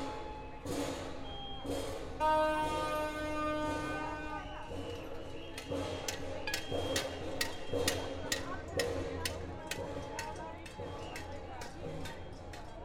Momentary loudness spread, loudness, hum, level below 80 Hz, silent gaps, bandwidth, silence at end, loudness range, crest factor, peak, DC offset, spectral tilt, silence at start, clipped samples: 11 LU; -38 LUFS; none; -52 dBFS; none; 16 kHz; 0 s; 6 LU; 22 dB; -16 dBFS; under 0.1%; -4 dB/octave; 0 s; under 0.1%